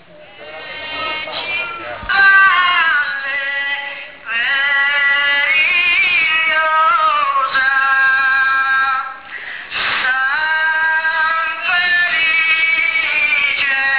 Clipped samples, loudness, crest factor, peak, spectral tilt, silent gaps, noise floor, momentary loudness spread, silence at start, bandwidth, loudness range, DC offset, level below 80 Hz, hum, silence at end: under 0.1%; -13 LUFS; 12 dB; -4 dBFS; -3.5 dB/octave; none; -37 dBFS; 12 LU; 0.15 s; 4 kHz; 3 LU; 0.4%; -52 dBFS; none; 0 s